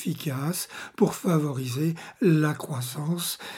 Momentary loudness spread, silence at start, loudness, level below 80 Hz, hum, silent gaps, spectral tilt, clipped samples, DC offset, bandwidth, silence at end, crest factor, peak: 9 LU; 0 s; -27 LUFS; -72 dBFS; none; none; -5.5 dB/octave; under 0.1%; under 0.1%; 17 kHz; 0 s; 20 dB; -8 dBFS